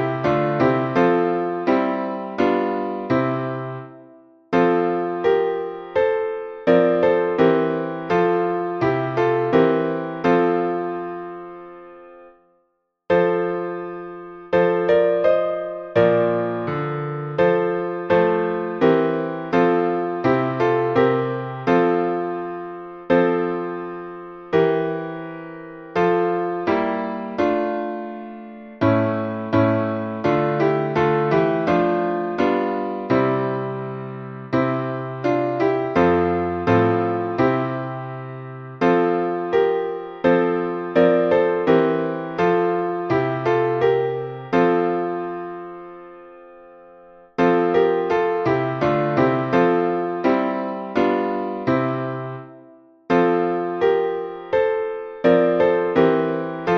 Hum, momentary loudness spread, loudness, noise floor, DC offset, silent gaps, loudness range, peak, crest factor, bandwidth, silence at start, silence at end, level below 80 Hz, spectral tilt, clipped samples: none; 13 LU; -20 LUFS; -69 dBFS; under 0.1%; none; 4 LU; -2 dBFS; 18 dB; 6.2 kHz; 0 s; 0 s; -56 dBFS; -8.5 dB/octave; under 0.1%